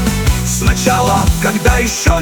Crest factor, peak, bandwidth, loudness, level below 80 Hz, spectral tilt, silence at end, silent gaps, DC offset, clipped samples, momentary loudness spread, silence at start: 12 dB; 0 dBFS; 19.5 kHz; -13 LUFS; -18 dBFS; -4.5 dB/octave; 0 s; none; under 0.1%; under 0.1%; 3 LU; 0 s